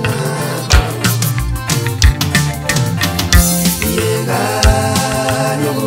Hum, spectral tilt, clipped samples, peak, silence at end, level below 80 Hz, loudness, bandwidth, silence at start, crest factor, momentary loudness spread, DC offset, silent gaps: none; -4 dB/octave; under 0.1%; 0 dBFS; 0 s; -20 dBFS; -14 LUFS; 16.5 kHz; 0 s; 14 dB; 5 LU; under 0.1%; none